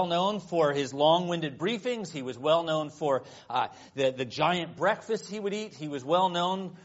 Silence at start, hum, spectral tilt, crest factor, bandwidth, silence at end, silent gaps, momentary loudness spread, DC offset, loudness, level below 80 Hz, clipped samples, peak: 0 s; none; -3.5 dB/octave; 18 dB; 8 kHz; 0.05 s; none; 9 LU; under 0.1%; -29 LUFS; -72 dBFS; under 0.1%; -10 dBFS